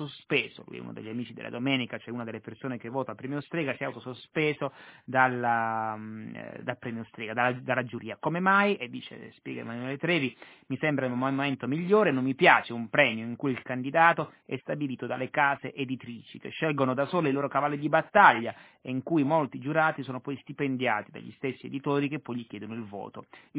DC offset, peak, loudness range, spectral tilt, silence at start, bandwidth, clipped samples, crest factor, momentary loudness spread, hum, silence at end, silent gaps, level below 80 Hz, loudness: under 0.1%; -4 dBFS; 7 LU; -4 dB/octave; 0 s; 4 kHz; under 0.1%; 24 dB; 16 LU; none; 0 s; none; -74 dBFS; -28 LUFS